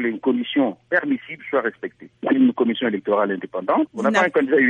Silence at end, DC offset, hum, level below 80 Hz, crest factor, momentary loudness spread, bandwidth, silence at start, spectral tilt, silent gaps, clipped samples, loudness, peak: 0 s; under 0.1%; none; -72 dBFS; 16 dB; 9 LU; 8 kHz; 0 s; -5.5 dB/octave; none; under 0.1%; -21 LUFS; -4 dBFS